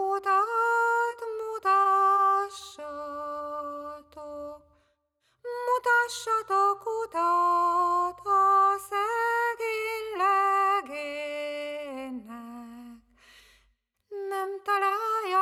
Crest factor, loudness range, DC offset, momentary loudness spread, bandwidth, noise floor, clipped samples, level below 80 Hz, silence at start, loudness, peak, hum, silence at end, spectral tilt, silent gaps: 14 dB; 13 LU; under 0.1%; 18 LU; 15.5 kHz; -74 dBFS; under 0.1%; -68 dBFS; 0 s; -26 LUFS; -14 dBFS; none; 0 s; -2 dB/octave; none